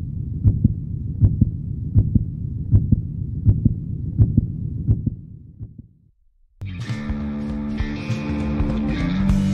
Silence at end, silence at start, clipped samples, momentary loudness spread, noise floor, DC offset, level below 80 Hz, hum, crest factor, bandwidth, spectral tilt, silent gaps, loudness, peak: 0 s; 0 s; under 0.1%; 12 LU; -57 dBFS; under 0.1%; -28 dBFS; none; 20 dB; 7.2 kHz; -9 dB/octave; none; -22 LUFS; -2 dBFS